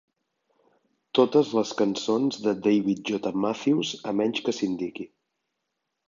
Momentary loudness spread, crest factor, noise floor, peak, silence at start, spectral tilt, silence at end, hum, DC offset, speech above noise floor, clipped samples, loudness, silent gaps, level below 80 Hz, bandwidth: 8 LU; 20 dB; -81 dBFS; -6 dBFS; 1.15 s; -5.5 dB/octave; 1 s; none; under 0.1%; 56 dB; under 0.1%; -25 LUFS; none; -70 dBFS; 7.6 kHz